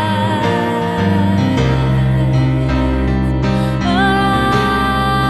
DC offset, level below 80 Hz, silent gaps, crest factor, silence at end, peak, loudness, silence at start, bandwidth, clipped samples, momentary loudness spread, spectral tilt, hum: under 0.1%; -24 dBFS; none; 12 dB; 0 s; -2 dBFS; -15 LUFS; 0 s; 12.5 kHz; under 0.1%; 3 LU; -7 dB/octave; none